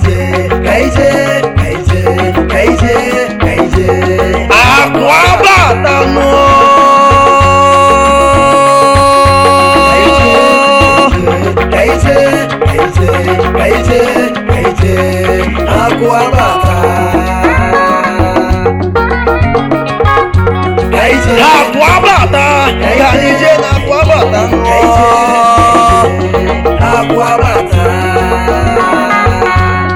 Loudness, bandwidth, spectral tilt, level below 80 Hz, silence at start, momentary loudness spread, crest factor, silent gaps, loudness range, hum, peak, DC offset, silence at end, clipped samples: -7 LUFS; 17 kHz; -5.5 dB/octave; -20 dBFS; 0 s; 6 LU; 8 dB; none; 5 LU; none; 0 dBFS; 0.2%; 0 s; 3%